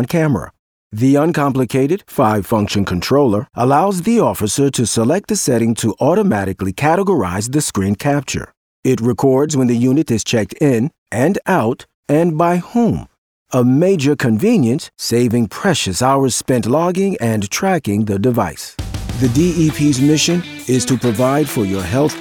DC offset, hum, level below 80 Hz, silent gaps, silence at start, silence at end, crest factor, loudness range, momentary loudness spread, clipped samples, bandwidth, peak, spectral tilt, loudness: under 0.1%; none; -42 dBFS; 0.59-0.90 s, 8.57-8.83 s, 10.98-11.06 s, 11.94-12.03 s, 13.18-13.46 s; 0 s; 0 s; 14 dB; 2 LU; 5 LU; under 0.1%; 19.5 kHz; -2 dBFS; -5.5 dB/octave; -15 LUFS